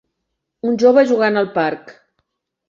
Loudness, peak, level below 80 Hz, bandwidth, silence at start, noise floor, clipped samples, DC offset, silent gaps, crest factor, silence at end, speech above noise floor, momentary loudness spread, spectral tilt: -16 LUFS; -2 dBFS; -64 dBFS; 7.4 kHz; 0.65 s; -76 dBFS; under 0.1%; under 0.1%; none; 16 dB; 0.8 s; 61 dB; 12 LU; -6 dB/octave